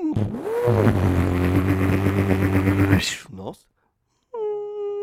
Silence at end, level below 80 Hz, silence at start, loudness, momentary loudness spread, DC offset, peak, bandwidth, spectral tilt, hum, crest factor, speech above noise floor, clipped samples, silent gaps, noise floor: 0 s; -40 dBFS; 0 s; -21 LUFS; 13 LU; under 0.1%; -4 dBFS; 15.5 kHz; -7 dB/octave; none; 18 dB; 48 dB; under 0.1%; none; -70 dBFS